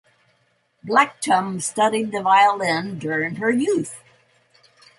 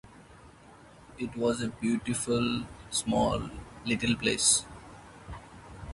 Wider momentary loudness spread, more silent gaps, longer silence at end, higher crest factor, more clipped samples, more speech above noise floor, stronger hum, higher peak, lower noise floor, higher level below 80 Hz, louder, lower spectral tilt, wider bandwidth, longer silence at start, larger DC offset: second, 10 LU vs 23 LU; neither; first, 1 s vs 0 s; about the same, 20 dB vs 22 dB; neither; first, 45 dB vs 24 dB; neither; first, -2 dBFS vs -10 dBFS; first, -65 dBFS vs -54 dBFS; second, -68 dBFS vs -52 dBFS; first, -20 LUFS vs -29 LUFS; about the same, -4 dB/octave vs -3 dB/octave; about the same, 11.5 kHz vs 11.5 kHz; first, 0.85 s vs 0.05 s; neither